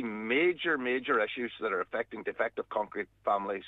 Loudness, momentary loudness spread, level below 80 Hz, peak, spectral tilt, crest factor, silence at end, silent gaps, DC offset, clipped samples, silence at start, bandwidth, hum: -31 LUFS; 8 LU; -72 dBFS; -16 dBFS; -6.5 dB/octave; 16 dB; 0 s; none; under 0.1%; under 0.1%; 0 s; 4.1 kHz; none